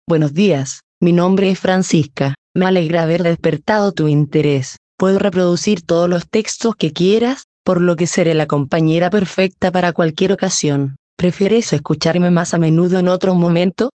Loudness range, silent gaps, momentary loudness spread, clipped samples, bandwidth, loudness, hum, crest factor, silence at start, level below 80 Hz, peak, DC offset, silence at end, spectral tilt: 1 LU; 0.83-1.01 s, 2.38-2.55 s, 4.77-4.98 s, 7.44-7.65 s, 10.99-11.17 s; 5 LU; under 0.1%; 9 kHz; -15 LUFS; none; 14 dB; 0.1 s; -52 dBFS; 0 dBFS; under 0.1%; 0.1 s; -6 dB/octave